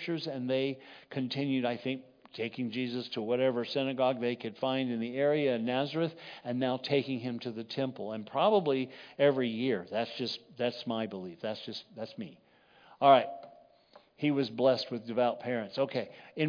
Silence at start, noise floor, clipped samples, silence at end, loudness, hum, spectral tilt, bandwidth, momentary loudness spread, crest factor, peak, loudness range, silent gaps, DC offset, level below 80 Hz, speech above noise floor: 0 s; -61 dBFS; under 0.1%; 0 s; -32 LUFS; none; -7 dB/octave; 5.2 kHz; 12 LU; 22 dB; -10 dBFS; 4 LU; none; under 0.1%; -84 dBFS; 30 dB